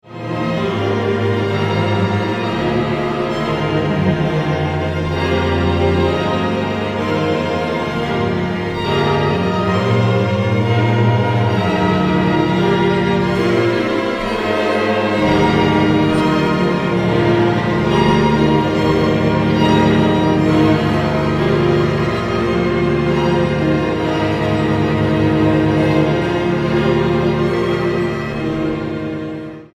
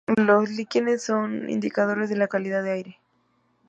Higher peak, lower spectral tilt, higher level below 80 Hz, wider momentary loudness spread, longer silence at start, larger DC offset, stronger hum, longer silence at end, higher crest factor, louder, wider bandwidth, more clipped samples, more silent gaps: first, 0 dBFS vs -6 dBFS; first, -7.5 dB/octave vs -6 dB/octave; first, -36 dBFS vs -70 dBFS; second, 5 LU vs 8 LU; about the same, 0.05 s vs 0.1 s; neither; neither; second, 0.1 s vs 0.8 s; about the same, 14 dB vs 18 dB; first, -16 LUFS vs -24 LUFS; first, 12.5 kHz vs 8.2 kHz; neither; neither